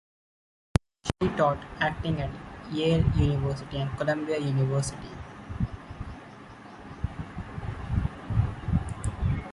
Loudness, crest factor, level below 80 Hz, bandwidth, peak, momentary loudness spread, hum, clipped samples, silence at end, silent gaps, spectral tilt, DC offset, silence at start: -29 LUFS; 24 dB; -38 dBFS; 11.5 kHz; -4 dBFS; 16 LU; none; under 0.1%; 0 s; none; -6.5 dB/octave; under 0.1%; 1.05 s